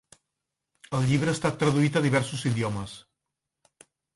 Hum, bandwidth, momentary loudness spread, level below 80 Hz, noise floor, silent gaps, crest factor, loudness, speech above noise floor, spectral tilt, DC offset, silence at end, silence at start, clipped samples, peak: none; 11.5 kHz; 12 LU; -58 dBFS; -85 dBFS; none; 18 dB; -26 LUFS; 60 dB; -6 dB/octave; under 0.1%; 1.15 s; 0.9 s; under 0.1%; -8 dBFS